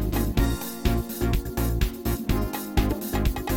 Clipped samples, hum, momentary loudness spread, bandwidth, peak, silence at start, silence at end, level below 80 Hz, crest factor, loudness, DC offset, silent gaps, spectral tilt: under 0.1%; none; 2 LU; 17 kHz; -8 dBFS; 0 s; 0 s; -28 dBFS; 16 dB; -27 LUFS; under 0.1%; none; -6 dB/octave